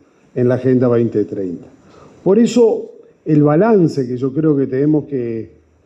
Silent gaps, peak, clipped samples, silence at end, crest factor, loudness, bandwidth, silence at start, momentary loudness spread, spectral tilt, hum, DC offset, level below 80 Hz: none; -2 dBFS; under 0.1%; 0.4 s; 14 dB; -15 LUFS; 8.4 kHz; 0.35 s; 14 LU; -8.5 dB/octave; none; under 0.1%; -58 dBFS